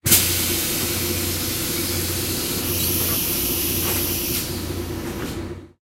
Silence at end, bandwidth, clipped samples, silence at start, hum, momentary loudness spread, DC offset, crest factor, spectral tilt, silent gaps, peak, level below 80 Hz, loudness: 0.15 s; 16 kHz; under 0.1%; 0.05 s; none; 10 LU; under 0.1%; 22 dB; -2.5 dB/octave; none; 0 dBFS; -40 dBFS; -21 LUFS